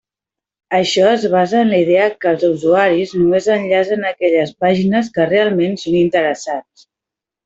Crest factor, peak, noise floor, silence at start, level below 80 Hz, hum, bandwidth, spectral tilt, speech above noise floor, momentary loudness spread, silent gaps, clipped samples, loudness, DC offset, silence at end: 12 dB; -2 dBFS; -86 dBFS; 0.7 s; -56 dBFS; none; 8 kHz; -5.5 dB/octave; 72 dB; 5 LU; none; under 0.1%; -15 LUFS; under 0.1%; 0.85 s